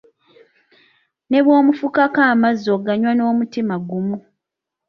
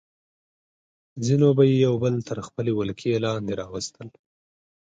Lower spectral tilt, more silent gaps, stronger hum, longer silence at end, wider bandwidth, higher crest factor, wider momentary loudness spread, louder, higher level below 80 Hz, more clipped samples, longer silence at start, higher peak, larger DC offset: about the same, -7.5 dB/octave vs -7 dB/octave; neither; neither; second, 0.7 s vs 0.85 s; second, 6.4 kHz vs 9.2 kHz; about the same, 16 dB vs 20 dB; second, 10 LU vs 14 LU; first, -17 LUFS vs -23 LUFS; second, -64 dBFS vs -58 dBFS; neither; first, 1.3 s vs 1.15 s; first, -2 dBFS vs -6 dBFS; neither